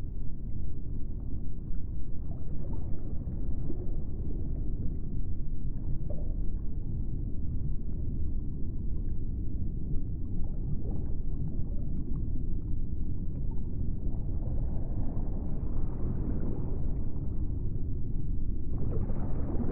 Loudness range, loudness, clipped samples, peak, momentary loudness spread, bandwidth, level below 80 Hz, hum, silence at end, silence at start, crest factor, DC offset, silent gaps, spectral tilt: 3 LU; -37 LUFS; under 0.1%; -16 dBFS; 5 LU; 1.5 kHz; -32 dBFS; none; 0 s; 0 s; 12 dB; under 0.1%; none; -14 dB/octave